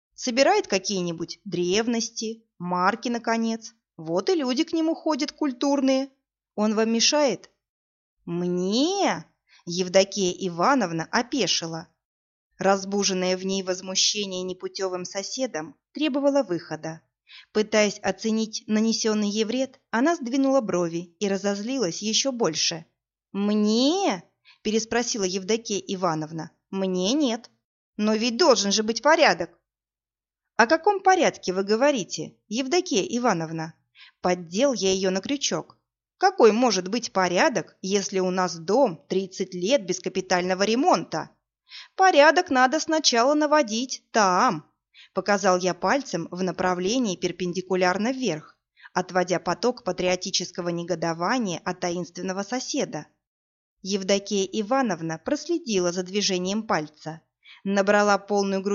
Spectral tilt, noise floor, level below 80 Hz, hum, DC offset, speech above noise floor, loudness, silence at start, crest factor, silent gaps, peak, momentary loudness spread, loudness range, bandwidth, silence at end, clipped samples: -3 dB/octave; under -90 dBFS; -66 dBFS; none; under 0.1%; over 66 dB; -24 LUFS; 0.2 s; 22 dB; 7.69-8.17 s, 12.05-12.51 s, 27.64-27.93 s, 53.27-53.77 s; -2 dBFS; 12 LU; 5 LU; 7.4 kHz; 0 s; under 0.1%